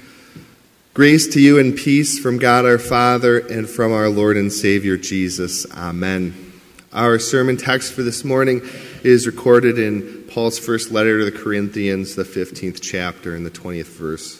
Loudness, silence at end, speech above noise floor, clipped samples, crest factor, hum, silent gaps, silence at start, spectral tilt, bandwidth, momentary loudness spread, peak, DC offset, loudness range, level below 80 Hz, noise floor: -16 LUFS; 0.05 s; 34 dB; under 0.1%; 16 dB; none; none; 0.35 s; -5 dB/octave; 16 kHz; 15 LU; 0 dBFS; under 0.1%; 7 LU; -48 dBFS; -50 dBFS